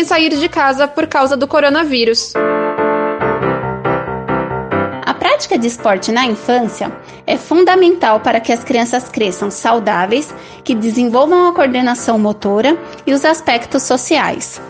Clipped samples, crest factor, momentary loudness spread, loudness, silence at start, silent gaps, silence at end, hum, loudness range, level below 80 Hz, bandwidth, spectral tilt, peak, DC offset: under 0.1%; 14 dB; 8 LU; -14 LUFS; 0 s; none; 0 s; none; 3 LU; -46 dBFS; 9.8 kHz; -4 dB/octave; 0 dBFS; under 0.1%